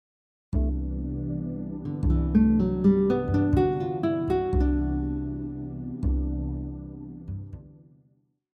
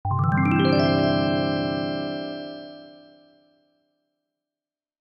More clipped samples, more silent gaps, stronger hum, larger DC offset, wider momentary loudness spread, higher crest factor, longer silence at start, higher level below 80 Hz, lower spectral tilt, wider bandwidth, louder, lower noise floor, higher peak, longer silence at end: neither; neither; neither; neither; about the same, 16 LU vs 16 LU; about the same, 16 dB vs 16 dB; first, 0.5 s vs 0.05 s; first, -32 dBFS vs -54 dBFS; first, -10.5 dB/octave vs -9 dB/octave; about the same, 5.4 kHz vs 5.8 kHz; second, -26 LUFS vs -23 LUFS; second, -67 dBFS vs under -90 dBFS; about the same, -10 dBFS vs -8 dBFS; second, 0.85 s vs 2.1 s